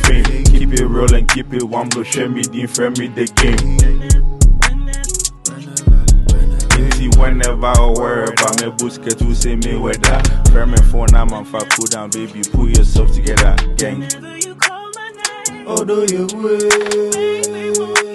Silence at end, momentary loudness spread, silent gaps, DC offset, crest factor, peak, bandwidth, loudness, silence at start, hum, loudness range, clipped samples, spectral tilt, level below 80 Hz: 0 s; 7 LU; none; under 0.1%; 12 dB; 0 dBFS; 12.5 kHz; -15 LUFS; 0 s; none; 2 LU; under 0.1%; -4 dB/octave; -14 dBFS